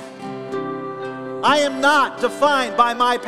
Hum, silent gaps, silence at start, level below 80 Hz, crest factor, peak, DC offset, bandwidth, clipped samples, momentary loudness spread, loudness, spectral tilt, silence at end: none; none; 0 s; -60 dBFS; 18 dB; -2 dBFS; under 0.1%; 14 kHz; under 0.1%; 13 LU; -19 LUFS; -3 dB/octave; 0 s